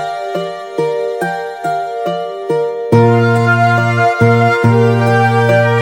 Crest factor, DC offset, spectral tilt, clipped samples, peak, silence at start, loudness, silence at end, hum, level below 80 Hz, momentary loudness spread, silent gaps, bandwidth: 12 dB; under 0.1%; -7.5 dB/octave; under 0.1%; 0 dBFS; 0 s; -13 LUFS; 0 s; none; -52 dBFS; 9 LU; none; 15.5 kHz